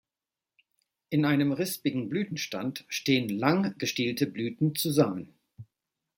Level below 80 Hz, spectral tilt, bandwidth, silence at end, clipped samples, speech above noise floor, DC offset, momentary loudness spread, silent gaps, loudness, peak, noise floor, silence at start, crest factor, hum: -72 dBFS; -5 dB/octave; 17 kHz; 0.55 s; under 0.1%; over 62 dB; under 0.1%; 7 LU; none; -28 LUFS; -8 dBFS; under -90 dBFS; 1.1 s; 22 dB; none